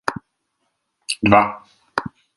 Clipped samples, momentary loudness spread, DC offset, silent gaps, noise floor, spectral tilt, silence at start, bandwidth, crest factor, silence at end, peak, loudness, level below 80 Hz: under 0.1%; 24 LU; under 0.1%; none; -73 dBFS; -5 dB/octave; 0.05 s; 11.5 kHz; 22 dB; 0.3 s; 0 dBFS; -19 LUFS; -48 dBFS